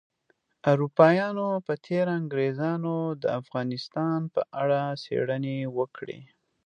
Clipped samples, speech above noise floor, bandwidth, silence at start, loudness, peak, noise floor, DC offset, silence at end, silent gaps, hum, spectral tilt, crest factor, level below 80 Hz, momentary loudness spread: under 0.1%; 45 dB; 9.2 kHz; 0.65 s; -27 LUFS; -4 dBFS; -71 dBFS; under 0.1%; 0.4 s; none; none; -8 dB/octave; 24 dB; -74 dBFS; 11 LU